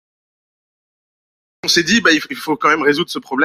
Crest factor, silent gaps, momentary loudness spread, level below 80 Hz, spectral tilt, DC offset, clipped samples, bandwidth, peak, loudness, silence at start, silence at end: 18 dB; none; 9 LU; -56 dBFS; -2.5 dB/octave; under 0.1%; under 0.1%; 16 kHz; 0 dBFS; -15 LUFS; 1.65 s; 0 s